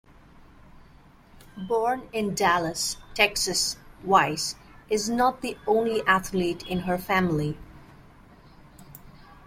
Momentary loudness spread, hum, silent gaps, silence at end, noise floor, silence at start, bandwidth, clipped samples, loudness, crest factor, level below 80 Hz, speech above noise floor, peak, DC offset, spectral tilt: 10 LU; none; none; 0.1 s; -53 dBFS; 0.75 s; 16.5 kHz; under 0.1%; -25 LUFS; 24 dB; -52 dBFS; 28 dB; -4 dBFS; under 0.1%; -3.5 dB/octave